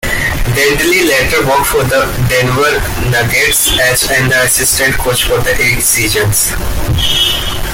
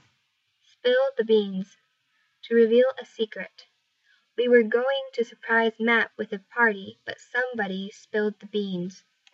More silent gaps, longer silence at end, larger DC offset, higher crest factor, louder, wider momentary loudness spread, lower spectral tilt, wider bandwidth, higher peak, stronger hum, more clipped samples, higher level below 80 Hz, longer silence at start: neither; second, 0 s vs 0.4 s; neither; second, 10 dB vs 20 dB; first, -10 LUFS vs -25 LUFS; second, 5 LU vs 15 LU; second, -2.5 dB/octave vs -6 dB/octave; first, 17 kHz vs 7.4 kHz; first, 0 dBFS vs -6 dBFS; neither; neither; first, -22 dBFS vs -88 dBFS; second, 0 s vs 0.85 s